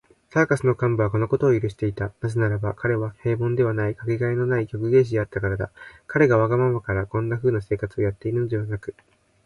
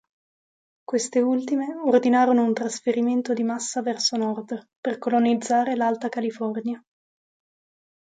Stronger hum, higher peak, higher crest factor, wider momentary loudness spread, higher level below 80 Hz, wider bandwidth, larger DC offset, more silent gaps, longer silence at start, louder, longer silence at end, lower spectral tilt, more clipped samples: neither; about the same, -6 dBFS vs -8 dBFS; about the same, 18 dB vs 18 dB; second, 8 LU vs 11 LU; first, -46 dBFS vs -76 dBFS; first, 11.5 kHz vs 9.4 kHz; neither; second, none vs 4.76-4.83 s; second, 0.35 s vs 0.9 s; about the same, -23 LUFS vs -23 LUFS; second, 0.55 s vs 1.3 s; first, -9 dB/octave vs -4 dB/octave; neither